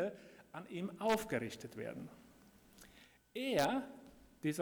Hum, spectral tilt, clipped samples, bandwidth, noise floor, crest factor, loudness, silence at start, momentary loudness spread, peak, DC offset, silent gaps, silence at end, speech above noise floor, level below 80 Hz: none; -5 dB/octave; under 0.1%; over 20 kHz; -64 dBFS; 20 dB; -40 LUFS; 0 s; 24 LU; -22 dBFS; under 0.1%; none; 0 s; 25 dB; -72 dBFS